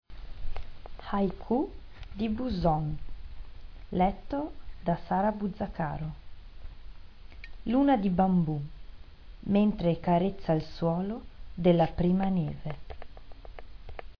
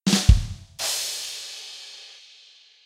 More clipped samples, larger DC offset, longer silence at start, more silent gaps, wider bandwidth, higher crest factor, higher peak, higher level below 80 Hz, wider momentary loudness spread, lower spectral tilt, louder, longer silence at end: neither; neither; about the same, 0.1 s vs 0.05 s; neither; second, 5.4 kHz vs 16 kHz; about the same, 20 dB vs 24 dB; second, -10 dBFS vs 0 dBFS; second, -42 dBFS vs -28 dBFS; about the same, 24 LU vs 22 LU; first, -10 dB/octave vs -4 dB/octave; second, -29 LUFS vs -24 LUFS; second, 0.05 s vs 0.75 s